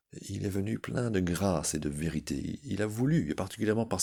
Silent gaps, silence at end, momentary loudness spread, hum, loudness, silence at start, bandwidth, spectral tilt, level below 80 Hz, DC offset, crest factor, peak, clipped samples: none; 0 s; 7 LU; none; -32 LUFS; 0.15 s; over 20 kHz; -5.5 dB/octave; -54 dBFS; under 0.1%; 16 dB; -14 dBFS; under 0.1%